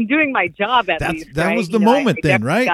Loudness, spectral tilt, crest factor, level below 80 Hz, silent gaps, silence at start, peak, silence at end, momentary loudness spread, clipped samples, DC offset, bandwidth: -16 LUFS; -6 dB/octave; 16 dB; -42 dBFS; none; 0 s; 0 dBFS; 0 s; 6 LU; under 0.1%; under 0.1%; 15 kHz